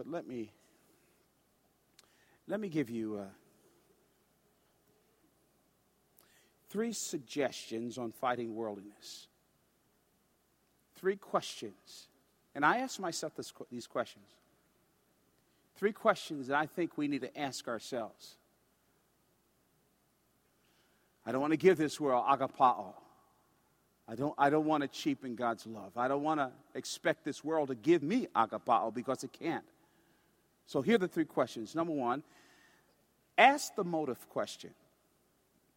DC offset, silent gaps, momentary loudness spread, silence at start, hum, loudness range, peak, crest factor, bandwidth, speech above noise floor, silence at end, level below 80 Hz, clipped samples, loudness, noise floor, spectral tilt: under 0.1%; none; 17 LU; 0 s; none; 10 LU; -8 dBFS; 28 dB; 16.5 kHz; 40 dB; 1.05 s; -80 dBFS; under 0.1%; -34 LUFS; -74 dBFS; -4.5 dB/octave